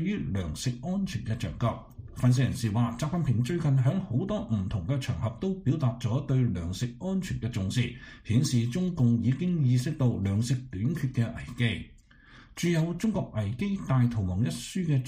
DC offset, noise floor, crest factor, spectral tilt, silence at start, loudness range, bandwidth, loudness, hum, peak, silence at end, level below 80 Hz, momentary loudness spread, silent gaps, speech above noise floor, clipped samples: under 0.1%; -54 dBFS; 14 dB; -7 dB/octave; 0 s; 3 LU; 15.5 kHz; -29 LUFS; none; -14 dBFS; 0 s; -50 dBFS; 7 LU; none; 26 dB; under 0.1%